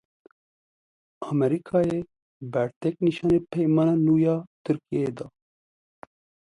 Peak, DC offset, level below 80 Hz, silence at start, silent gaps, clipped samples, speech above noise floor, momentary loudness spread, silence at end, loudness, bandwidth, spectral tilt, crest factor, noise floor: -10 dBFS; under 0.1%; -58 dBFS; 1.2 s; 2.22-2.40 s, 2.76-2.81 s, 4.47-4.65 s; under 0.1%; over 66 dB; 17 LU; 1.2 s; -25 LUFS; 10.5 kHz; -9 dB/octave; 16 dB; under -90 dBFS